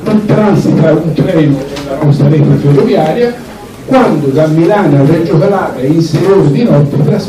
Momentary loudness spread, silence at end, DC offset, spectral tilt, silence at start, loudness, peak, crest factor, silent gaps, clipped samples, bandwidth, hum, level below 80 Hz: 5 LU; 0 s; under 0.1%; -8.5 dB/octave; 0 s; -9 LUFS; 0 dBFS; 8 dB; none; under 0.1%; 13 kHz; none; -38 dBFS